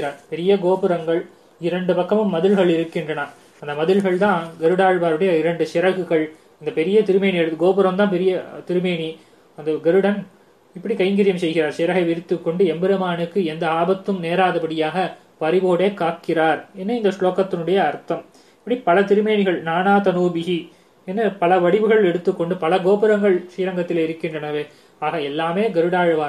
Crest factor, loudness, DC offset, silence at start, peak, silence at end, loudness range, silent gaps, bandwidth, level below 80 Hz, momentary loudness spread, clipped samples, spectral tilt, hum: 16 dB; -19 LUFS; under 0.1%; 0 s; -4 dBFS; 0 s; 2 LU; none; 11.5 kHz; -70 dBFS; 10 LU; under 0.1%; -7 dB/octave; none